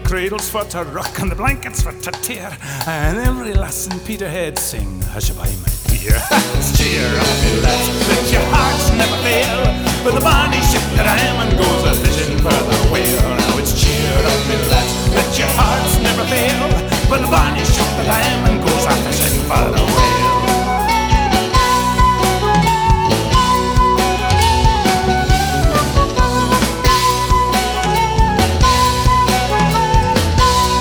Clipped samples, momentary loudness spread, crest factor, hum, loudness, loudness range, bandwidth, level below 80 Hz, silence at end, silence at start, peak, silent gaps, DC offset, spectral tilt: under 0.1%; 8 LU; 14 dB; none; -15 LUFS; 7 LU; over 20 kHz; -20 dBFS; 0 s; 0 s; 0 dBFS; none; under 0.1%; -4 dB/octave